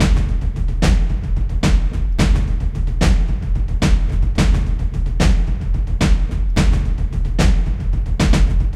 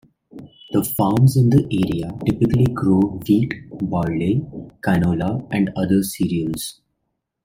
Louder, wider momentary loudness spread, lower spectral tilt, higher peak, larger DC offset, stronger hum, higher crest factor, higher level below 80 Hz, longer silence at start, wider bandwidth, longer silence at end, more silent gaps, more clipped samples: about the same, -19 LUFS vs -19 LUFS; second, 5 LU vs 10 LU; about the same, -6 dB/octave vs -7 dB/octave; first, 0 dBFS vs -4 dBFS; neither; neither; about the same, 14 dB vs 16 dB; first, -16 dBFS vs -44 dBFS; second, 0 s vs 0.35 s; second, 10.5 kHz vs 16.5 kHz; second, 0 s vs 0.75 s; neither; neither